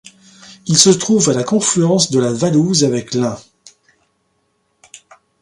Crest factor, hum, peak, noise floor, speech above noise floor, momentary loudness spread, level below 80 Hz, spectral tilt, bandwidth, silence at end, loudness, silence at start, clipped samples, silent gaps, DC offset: 16 dB; none; 0 dBFS; -64 dBFS; 51 dB; 9 LU; -56 dBFS; -4 dB/octave; 16 kHz; 2 s; -14 LUFS; 0.5 s; under 0.1%; none; under 0.1%